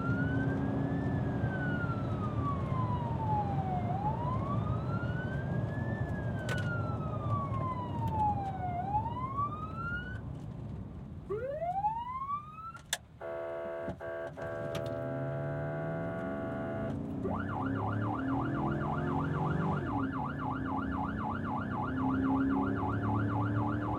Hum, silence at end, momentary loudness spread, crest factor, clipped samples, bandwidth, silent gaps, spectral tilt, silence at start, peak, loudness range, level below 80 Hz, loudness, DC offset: none; 0 s; 7 LU; 20 dB; under 0.1%; 15.5 kHz; none; -7.5 dB/octave; 0 s; -14 dBFS; 5 LU; -50 dBFS; -35 LUFS; under 0.1%